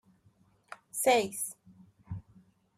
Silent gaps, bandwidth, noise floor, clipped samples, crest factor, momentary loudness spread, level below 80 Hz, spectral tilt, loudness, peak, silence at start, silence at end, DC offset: none; 15 kHz; -67 dBFS; under 0.1%; 22 dB; 25 LU; -68 dBFS; -3 dB/octave; -30 LUFS; -14 dBFS; 0.7 s; 0.55 s; under 0.1%